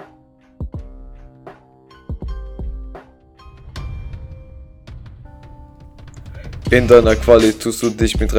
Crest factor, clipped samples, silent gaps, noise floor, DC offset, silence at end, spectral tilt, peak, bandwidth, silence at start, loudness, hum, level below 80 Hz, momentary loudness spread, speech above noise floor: 18 dB; 0.2%; none; -49 dBFS; under 0.1%; 0 s; -5.5 dB/octave; 0 dBFS; 16.5 kHz; 0 s; -14 LUFS; none; -30 dBFS; 28 LU; 37 dB